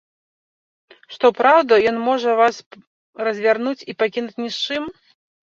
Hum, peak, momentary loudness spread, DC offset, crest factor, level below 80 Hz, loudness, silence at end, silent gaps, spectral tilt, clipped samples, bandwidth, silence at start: none; -2 dBFS; 13 LU; under 0.1%; 18 dB; -64 dBFS; -18 LUFS; 0.65 s; 2.66-2.71 s, 2.87-3.13 s; -4 dB/octave; under 0.1%; 7.6 kHz; 1.1 s